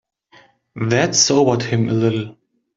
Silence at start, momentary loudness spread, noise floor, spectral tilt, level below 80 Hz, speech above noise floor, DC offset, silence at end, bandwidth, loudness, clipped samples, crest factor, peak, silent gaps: 0.75 s; 12 LU; -52 dBFS; -4 dB/octave; -56 dBFS; 35 dB; under 0.1%; 0.45 s; 7.8 kHz; -17 LUFS; under 0.1%; 16 dB; -2 dBFS; none